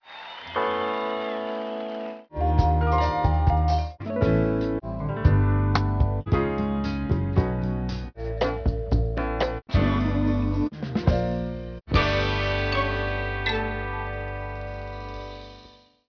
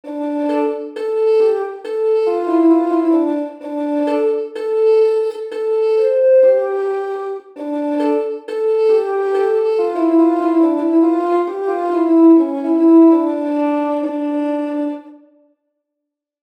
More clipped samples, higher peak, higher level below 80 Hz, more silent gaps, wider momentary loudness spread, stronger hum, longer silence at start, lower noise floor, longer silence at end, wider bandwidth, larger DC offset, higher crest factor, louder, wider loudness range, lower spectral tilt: neither; second, -6 dBFS vs -2 dBFS; first, -30 dBFS vs -76 dBFS; neither; about the same, 12 LU vs 11 LU; neither; about the same, 0.05 s vs 0.05 s; second, -51 dBFS vs -80 dBFS; second, 0.4 s vs 1.25 s; about the same, 5.4 kHz vs 5.2 kHz; neither; first, 20 dB vs 12 dB; second, -25 LUFS vs -16 LUFS; about the same, 3 LU vs 4 LU; first, -8 dB/octave vs -5.5 dB/octave